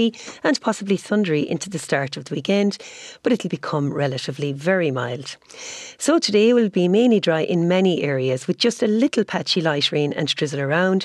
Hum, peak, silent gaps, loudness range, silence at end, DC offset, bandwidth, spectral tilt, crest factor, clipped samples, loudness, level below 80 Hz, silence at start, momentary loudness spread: none; -6 dBFS; none; 5 LU; 0 s; under 0.1%; 12.5 kHz; -5 dB/octave; 16 dB; under 0.1%; -20 LUFS; -68 dBFS; 0 s; 10 LU